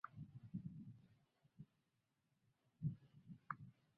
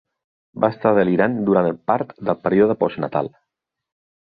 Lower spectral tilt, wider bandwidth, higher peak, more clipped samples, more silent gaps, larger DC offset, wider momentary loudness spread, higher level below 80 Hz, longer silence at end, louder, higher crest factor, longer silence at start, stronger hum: second, -8.5 dB/octave vs -11.5 dB/octave; about the same, 5.2 kHz vs 5 kHz; second, -28 dBFS vs -2 dBFS; neither; neither; neither; first, 17 LU vs 8 LU; second, -78 dBFS vs -58 dBFS; second, 0.25 s vs 0.95 s; second, -54 LUFS vs -19 LUFS; first, 26 dB vs 18 dB; second, 0.05 s vs 0.55 s; neither